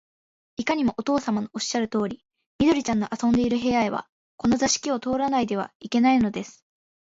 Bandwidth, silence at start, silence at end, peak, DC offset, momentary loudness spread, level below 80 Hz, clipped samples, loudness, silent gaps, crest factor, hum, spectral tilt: 8 kHz; 0.6 s; 0.5 s; -8 dBFS; under 0.1%; 10 LU; -54 dBFS; under 0.1%; -24 LUFS; 2.46-2.59 s, 4.09-4.38 s, 5.75-5.80 s; 16 dB; none; -4 dB/octave